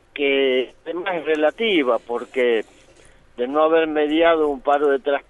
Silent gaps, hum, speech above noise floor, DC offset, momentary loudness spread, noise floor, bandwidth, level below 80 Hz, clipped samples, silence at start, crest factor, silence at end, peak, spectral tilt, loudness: none; none; 31 dB; under 0.1%; 9 LU; -50 dBFS; 10.5 kHz; -56 dBFS; under 0.1%; 0.15 s; 16 dB; 0.1 s; -4 dBFS; -5 dB/octave; -20 LUFS